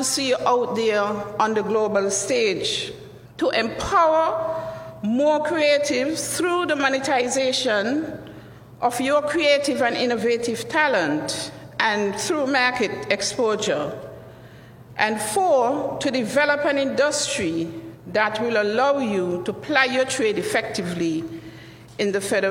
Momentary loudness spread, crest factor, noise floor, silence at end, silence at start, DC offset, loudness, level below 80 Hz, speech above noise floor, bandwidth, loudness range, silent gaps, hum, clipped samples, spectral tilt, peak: 10 LU; 20 dB; -44 dBFS; 0 s; 0 s; under 0.1%; -22 LUFS; -56 dBFS; 22 dB; 17 kHz; 2 LU; none; none; under 0.1%; -3 dB/octave; -2 dBFS